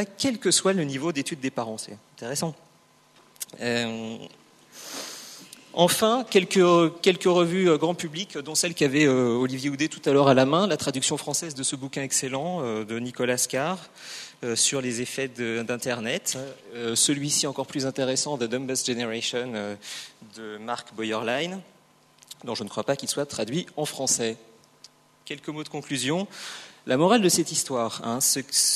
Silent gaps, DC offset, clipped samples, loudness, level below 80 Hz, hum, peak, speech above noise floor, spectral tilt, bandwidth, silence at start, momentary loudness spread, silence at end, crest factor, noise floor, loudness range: none; under 0.1%; under 0.1%; -25 LUFS; -70 dBFS; none; -4 dBFS; 33 dB; -3.5 dB/octave; 13.5 kHz; 0 s; 17 LU; 0 s; 22 dB; -59 dBFS; 9 LU